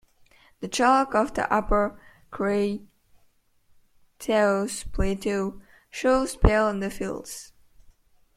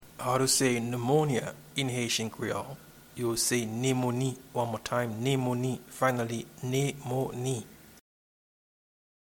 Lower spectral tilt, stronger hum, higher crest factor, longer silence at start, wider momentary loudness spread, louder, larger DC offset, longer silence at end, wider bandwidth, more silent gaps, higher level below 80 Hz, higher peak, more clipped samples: about the same, -5 dB/octave vs -4.5 dB/octave; neither; about the same, 24 dB vs 20 dB; first, 0.6 s vs 0 s; first, 15 LU vs 9 LU; first, -25 LUFS vs -30 LUFS; neither; second, 0.9 s vs 1.35 s; second, 15.5 kHz vs 19 kHz; neither; first, -36 dBFS vs -64 dBFS; first, -2 dBFS vs -12 dBFS; neither